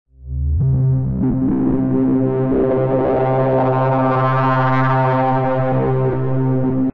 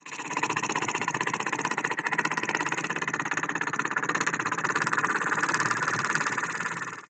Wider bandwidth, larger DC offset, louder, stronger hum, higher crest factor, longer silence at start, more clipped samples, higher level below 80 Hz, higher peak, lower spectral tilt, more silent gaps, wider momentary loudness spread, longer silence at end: second, 4.6 kHz vs 9.4 kHz; neither; first, -17 LUFS vs -27 LUFS; neither; second, 10 dB vs 22 dB; first, 0.25 s vs 0.05 s; neither; first, -32 dBFS vs -78 dBFS; first, -4 dBFS vs -8 dBFS; first, -11 dB/octave vs -2.5 dB/octave; neither; about the same, 3 LU vs 3 LU; about the same, 0 s vs 0.05 s